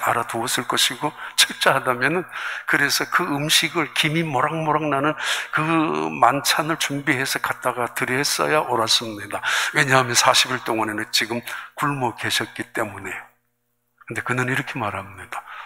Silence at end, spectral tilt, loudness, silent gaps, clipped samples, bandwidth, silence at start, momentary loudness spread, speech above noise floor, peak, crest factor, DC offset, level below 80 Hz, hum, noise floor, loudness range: 0 s; -2.5 dB/octave; -20 LUFS; none; under 0.1%; 16 kHz; 0 s; 11 LU; 50 dB; -2 dBFS; 22 dB; under 0.1%; -64 dBFS; 60 Hz at -55 dBFS; -72 dBFS; 7 LU